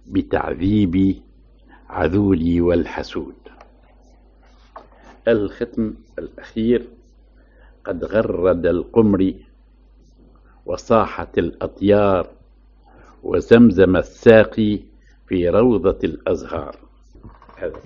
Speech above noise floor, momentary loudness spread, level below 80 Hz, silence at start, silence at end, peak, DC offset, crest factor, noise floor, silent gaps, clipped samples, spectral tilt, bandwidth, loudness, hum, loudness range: 32 dB; 18 LU; -40 dBFS; 0.1 s; 0.05 s; 0 dBFS; under 0.1%; 20 dB; -50 dBFS; none; under 0.1%; -6.5 dB/octave; 7.2 kHz; -18 LUFS; none; 9 LU